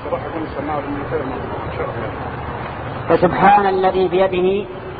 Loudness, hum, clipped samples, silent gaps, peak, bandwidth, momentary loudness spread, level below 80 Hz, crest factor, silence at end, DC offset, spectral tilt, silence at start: -18 LUFS; none; under 0.1%; none; 0 dBFS; 4.9 kHz; 14 LU; -40 dBFS; 18 dB; 0 s; under 0.1%; -10 dB/octave; 0 s